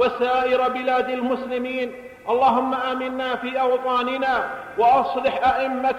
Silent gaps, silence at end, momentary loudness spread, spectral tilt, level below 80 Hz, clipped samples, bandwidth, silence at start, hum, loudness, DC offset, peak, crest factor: none; 0 s; 7 LU; -5 dB/octave; -56 dBFS; under 0.1%; 12.5 kHz; 0 s; none; -22 LUFS; under 0.1%; -8 dBFS; 12 dB